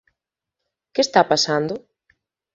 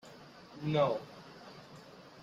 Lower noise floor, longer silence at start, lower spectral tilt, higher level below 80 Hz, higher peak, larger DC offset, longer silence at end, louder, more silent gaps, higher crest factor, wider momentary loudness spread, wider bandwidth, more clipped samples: first, -83 dBFS vs -54 dBFS; first, 0.95 s vs 0.05 s; second, -3.5 dB/octave vs -7 dB/octave; first, -64 dBFS vs -72 dBFS; first, 0 dBFS vs -18 dBFS; neither; first, 0.75 s vs 0 s; first, -19 LUFS vs -34 LUFS; neither; about the same, 22 dB vs 20 dB; second, 12 LU vs 22 LU; second, 7.8 kHz vs 12 kHz; neither